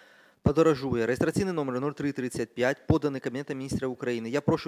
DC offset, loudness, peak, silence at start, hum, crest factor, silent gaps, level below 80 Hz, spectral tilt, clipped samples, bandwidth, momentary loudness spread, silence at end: under 0.1%; -28 LUFS; -10 dBFS; 0.45 s; none; 18 dB; none; -48 dBFS; -6.5 dB/octave; under 0.1%; 16 kHz; 9 LU; 0 s